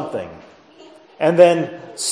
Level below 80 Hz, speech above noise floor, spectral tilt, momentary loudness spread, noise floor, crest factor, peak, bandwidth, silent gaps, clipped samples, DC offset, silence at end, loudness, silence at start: -64 dBFS; 28 dB; -4.5 dB/octave; 17 LU; -45 dBFS; 18 dB; 0 dBFS; 11 kHz; none; under 0.1%; under 0.1%; 0 s; -16 LUFS; 0 s